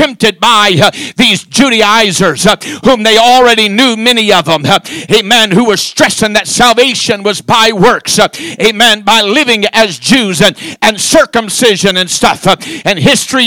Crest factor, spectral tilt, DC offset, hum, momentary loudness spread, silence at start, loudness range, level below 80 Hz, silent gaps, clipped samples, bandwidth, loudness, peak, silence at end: 8 dB; -3 dB/octave; 0.7%; none; 5 LU; 0 s; 2 LU; -40 dBFS; none; 6%; over 20 kHz; -7 LUFS; 0 dBFS; 0 s